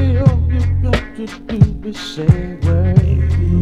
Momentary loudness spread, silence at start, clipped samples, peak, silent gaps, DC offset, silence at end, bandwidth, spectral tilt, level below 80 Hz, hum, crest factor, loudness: 12 LU; 0 s; 0.6%; 0 dBFS; none; under 0.1%; 0 s; 8 kHz; -8 dB/octave; -22 dBFS; none; 14 dB; -16 LUFS